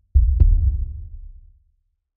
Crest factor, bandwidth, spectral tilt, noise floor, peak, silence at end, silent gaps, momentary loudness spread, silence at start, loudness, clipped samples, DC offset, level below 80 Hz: 16 dB; 0.8 kHz; -14 dB/octave; -66 dBFS; -4 dBFS; 0.9 s; none; 20 LU; 0.15 s; -20 LUFS; under 0.1%; under 0.1%; -20 dBFS